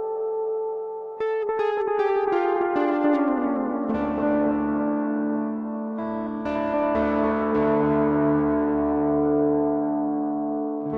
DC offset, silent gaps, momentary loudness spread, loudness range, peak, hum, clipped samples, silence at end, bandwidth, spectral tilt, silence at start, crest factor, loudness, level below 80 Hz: under 0.1%; none; 8 LU; 3 LU; -12 dBFS; none; under 0.1%; 0 s; 5 kHz; -9.5 dB/octave; 0 s; 12 dB; -24 LUFS; -50 dBFS